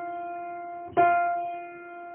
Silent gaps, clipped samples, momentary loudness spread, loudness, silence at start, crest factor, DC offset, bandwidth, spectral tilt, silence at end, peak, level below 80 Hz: none; under 0.1%; 17 LU; -27 LUFS; 0 s; 18 dB; under 0.1%; 3.4 kHz; 0.5 dB/octave; 0 s; -10 dBFS; -66 dBFS